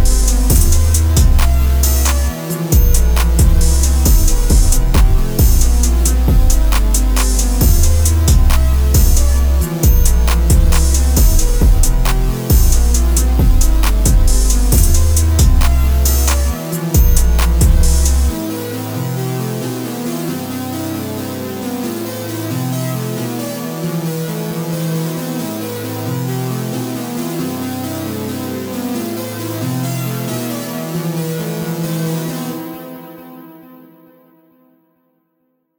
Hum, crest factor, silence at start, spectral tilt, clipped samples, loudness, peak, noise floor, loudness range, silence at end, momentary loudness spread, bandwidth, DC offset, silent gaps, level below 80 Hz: none; 12 dB; 0 s; -5 dB/octave; under 0.1%; -15 LUFS; 0 dBFS; -65 dBFS; 8 LU; 2.25 s; 10 LU; over 20 kHz; under 0.1%; none; -14 dBFS